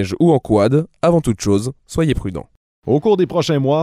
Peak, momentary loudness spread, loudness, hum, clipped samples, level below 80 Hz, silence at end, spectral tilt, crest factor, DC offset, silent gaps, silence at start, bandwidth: -2 dBFS; 9 LU; -17 LUFS; none; under 0.1%; -38 dBFS; 0 s; -7 dB/octave; 14 dB; under 0.1%; 2.57-2.82 s; 0 s; 15 kHz